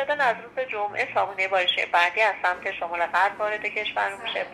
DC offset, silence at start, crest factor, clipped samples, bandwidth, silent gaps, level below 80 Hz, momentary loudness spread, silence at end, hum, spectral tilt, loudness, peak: under 0.1%; 0 s; 18 dB; under 0.1%; 13.5 kHz; none; -66 dBFS; 8 LU; 0 s; none; -2 dB/octave; -24 LUFS; -8 dBFS